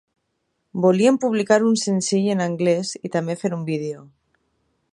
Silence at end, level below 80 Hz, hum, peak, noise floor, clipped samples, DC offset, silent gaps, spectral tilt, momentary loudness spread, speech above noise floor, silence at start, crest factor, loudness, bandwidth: 0.9 s; -70 dBFS; none; -4 dBFS; -73 dBFS; under 0.1%; under 0.1%; none; -5.5 dB/octave; 10 LU; 53 dB; 0.75 s; 18 dB; -20 LUFS; 11.5 kHz